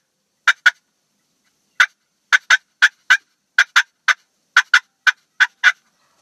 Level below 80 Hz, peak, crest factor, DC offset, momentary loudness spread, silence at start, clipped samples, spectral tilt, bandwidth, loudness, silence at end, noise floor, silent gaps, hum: -86 dBFS; 0 dBFS; 18 dB; under 0.1%; 5 LU; 0.45 s; under 0.1%; 5 dB/octave; 14 kHz; -16 LUFS; 0.5 s; -68 dBFS; none; none